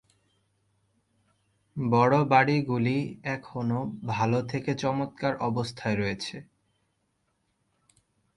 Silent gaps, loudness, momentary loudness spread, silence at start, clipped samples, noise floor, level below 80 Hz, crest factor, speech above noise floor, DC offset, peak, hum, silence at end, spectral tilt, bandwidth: none; -27 LUFS; 12 LU; 1.75 s; under 0.1%; -75 dBFS; -62 dBFS; 22 dB; 48 dB; under 0.1%; -8 dBFS; none; 1.95 s; -7 dB/octave; 11.5 kHz